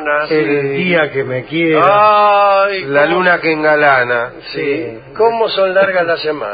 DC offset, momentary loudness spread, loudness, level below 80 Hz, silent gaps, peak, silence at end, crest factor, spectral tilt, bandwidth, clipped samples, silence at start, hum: under 0.1%; 10 LU; -12 LUFS; -52 dBFS; none; 0 dBFS; 0 s; 12 dB; -8.5 dB/octave; 5 kHz; under 0.1%; 0 s; none